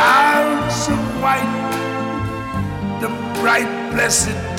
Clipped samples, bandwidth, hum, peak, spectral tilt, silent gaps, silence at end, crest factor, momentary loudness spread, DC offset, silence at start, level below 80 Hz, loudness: under 0.1%; 18 kHz; none; -2 dBFS; -3.5 dB/octave; none; 0 s; 16 dB; 9 LU; under 0.1%; 0 s; -40 dBFS; -18 LUFS